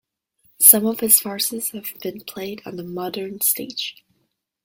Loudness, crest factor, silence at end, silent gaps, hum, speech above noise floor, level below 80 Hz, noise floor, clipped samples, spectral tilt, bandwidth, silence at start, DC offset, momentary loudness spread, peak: -16 LUFS; 22 dB; 0.7 s; none; none; 48 dB; -66 dBFS; -71 dBFS; under 0.1%; -2 dB/octave; 17 kHz; 0.6 s; under 0.1%; 20 LU; 0 dBFS